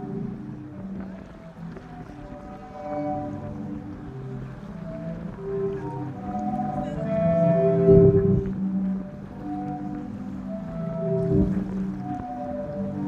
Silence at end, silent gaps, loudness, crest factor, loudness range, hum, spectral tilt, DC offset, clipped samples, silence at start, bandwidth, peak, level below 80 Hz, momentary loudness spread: 0 s; none; -26 LUFS; 22 dB; 13 LU; none; -10.5 dB/octave; under 0.1%; under 0.1%; 0 s; 6.6 kHz; -4 dBFS; -44 dBFS; 19 LU